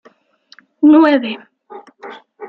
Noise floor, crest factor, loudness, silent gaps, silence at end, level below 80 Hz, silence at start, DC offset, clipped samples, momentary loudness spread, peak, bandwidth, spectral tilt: -51 dBFS; 14 dB; -12 LUFS; none; 0 s; -62 dBFS; 0.8 s; under 0.1%; under 0.1%; 26 LU; -2 dBFS; 5 kHz; -6.5 dB/octave